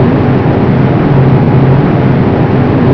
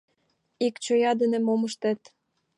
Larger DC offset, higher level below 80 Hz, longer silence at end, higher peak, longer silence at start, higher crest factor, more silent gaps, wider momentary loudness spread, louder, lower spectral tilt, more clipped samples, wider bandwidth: first, 2% vs under 0.1%; first, -28 dBFS vs -82 dBFS; second, 0 s vs 0.6 s; first, 0 dBFS vs -14 dBFS; second, 0 s vs 0.6 s; second, 6 dB vs 14 dB; neither; second, 2 LU vs 6 LU; first, -8 LUFS vs -26 LUFS; first, -10.5 dB/octave vs -4.5 dB/octave; first, 0.5% vs under 0.1%; second, 5.4 kHz vs 11 kHz